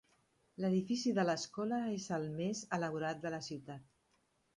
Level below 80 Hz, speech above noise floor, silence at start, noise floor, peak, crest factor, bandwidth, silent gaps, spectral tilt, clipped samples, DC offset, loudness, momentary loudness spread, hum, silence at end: -76 dBFS; 40 dB; 0.6 s; -77 dBFS; -20 dBFS; 20 dB; 11 kHz; none; -5.5 dB/octave; under 0.1%; under 0.1%; -38 LUFS; 12 LU; none; 0.75 s